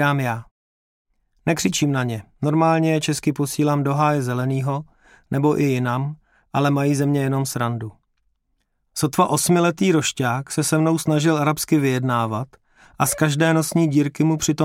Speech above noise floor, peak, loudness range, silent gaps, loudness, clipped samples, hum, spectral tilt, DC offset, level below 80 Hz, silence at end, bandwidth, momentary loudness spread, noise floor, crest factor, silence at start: 51 dB; -4 dBFS; 3 LU; 0.51-1.05 s; -20 LUFS; under 0.1%; none; -5.5 dB/octave; under 0.1%; -56 dBFS; 0 s; 17 kHz; 8 LU; -70 dBFS; 16 dB; 0 s